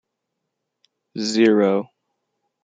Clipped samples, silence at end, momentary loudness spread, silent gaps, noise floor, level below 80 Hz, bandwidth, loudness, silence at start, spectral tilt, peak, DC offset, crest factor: under 0.1%; 0.8 s; 21 LU; none; -79 dBFS; -70 dBFS; 9.4 kHz; -19 LUFS; 1.15 s; -5 dB/octave; -4 dBFS; under 0.1%; 18 dB